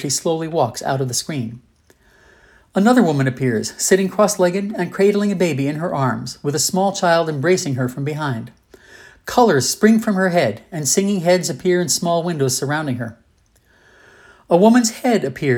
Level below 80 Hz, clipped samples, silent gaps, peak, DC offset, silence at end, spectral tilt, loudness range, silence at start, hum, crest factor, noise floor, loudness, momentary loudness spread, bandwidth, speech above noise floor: -58 dBFS; under 0.1%; none; 0 dBFS; under 0.1%; 0 s; -4.5 dB/octave; 3 LU; 0 s; none; 18 dB; -57 dBFS; -18 LUFS; 9 LU; 19.5 kHz; 40 dB